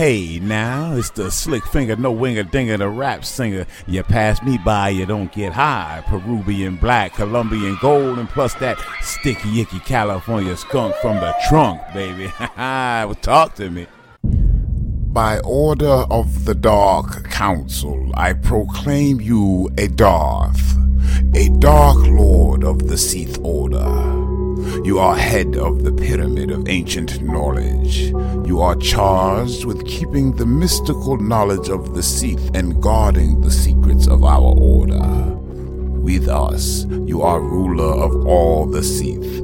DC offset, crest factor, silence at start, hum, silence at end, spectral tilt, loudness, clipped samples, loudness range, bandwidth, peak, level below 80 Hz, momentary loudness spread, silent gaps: under 0.1%; 16 dB; 0 s; none; 0 s; -5.5 dB/octave; -17 LUFS; under 0.1%; 5 LU; 17 kHz; 0 dBFS; -18 dBFS; 9 LU; none